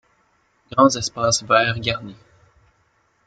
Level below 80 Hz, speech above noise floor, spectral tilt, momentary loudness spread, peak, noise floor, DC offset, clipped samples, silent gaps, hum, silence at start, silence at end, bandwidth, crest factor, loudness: -54 dBFS; 44 dB; -3.5 dB/octave; 11 LU; -2 dBFS; -63 dBFS; under 0.1%; under 0.1%; none; none; 0.75 s; 1.1 s; 9.2 kHz; 20 dB; -19 LUFS